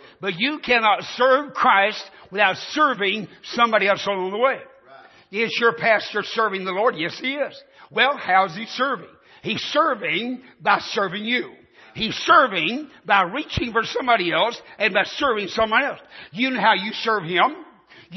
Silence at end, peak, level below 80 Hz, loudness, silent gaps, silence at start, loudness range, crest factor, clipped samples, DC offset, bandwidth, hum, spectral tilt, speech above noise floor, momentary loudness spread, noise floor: 0 s; -2 dBFS; -56 dBFS; -21 LUFS; none; 0.2 s; 3 LU; 18 dB; under 0.1%; under 0.1%; 6.2 kHz; none; -4 dB/octave; 27 dB; 11 LU; -48 dBFS